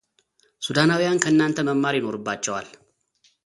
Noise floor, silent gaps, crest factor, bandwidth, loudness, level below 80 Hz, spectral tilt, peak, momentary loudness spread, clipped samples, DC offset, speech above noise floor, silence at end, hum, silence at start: -65 dBFS; none; 22 dB; 11.5 kHz; -22 LUFS; -64 dBFS; -4.5 dB/octave; -2 dBFS; 9 LU; under 0.1%; under 0.1%; 43 dB; 0.75 s; none; 0.6 s